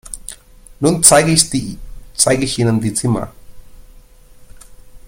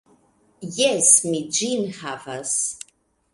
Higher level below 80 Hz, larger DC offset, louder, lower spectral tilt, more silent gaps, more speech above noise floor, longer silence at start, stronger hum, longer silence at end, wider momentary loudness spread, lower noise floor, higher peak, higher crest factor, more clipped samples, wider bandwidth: first, -38 dBFS vs -68 dBFS; neither; first, -13 LUFS vs -19 LUFS; first, -3.5 dB/octave vs -2 dB/octave; neither; second, 28 dB vs 40 dB; second, 0.05 s vs 0.6 s; neither; second, 0.1 s vs 0.55 s; first, 22 LU vs 19 LU; second, -42 dBFS vs -62 dBFS; about the same, 0 dBFS vs 0 dBFS; about the same, 18 dB vs 22 dB; neither; first, 17 kHz vs 11.5 kHz